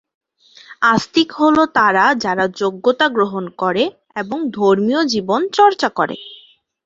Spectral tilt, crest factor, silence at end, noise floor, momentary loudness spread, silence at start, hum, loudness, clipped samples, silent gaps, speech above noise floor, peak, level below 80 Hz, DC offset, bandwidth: -4.5 dB/octave; 16 dB; 0.5 s; -44 dBFS; 9 LU; 0.7 s; none; -16 LUFS; under 0.1%; none; 28 dB; 0 dBFS; -58 dBFS; under 0.1%; 7.8 kHz